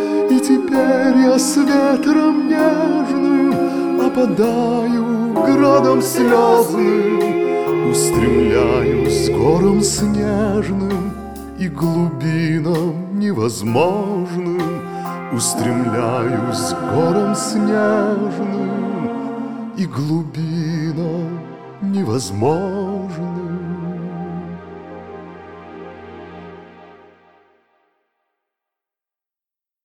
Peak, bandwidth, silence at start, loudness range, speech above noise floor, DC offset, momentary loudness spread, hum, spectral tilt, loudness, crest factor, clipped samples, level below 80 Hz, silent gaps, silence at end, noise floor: 0 dBFS; 19.5 kHz; 0 s; 12 LU; 74 dB; under 0.1%; 14 LU; none; -6 dB/octave; -17 LUFS; 16 dB; under 0.1%; -42 dBFS; none; 2.9 s; -89 dBFS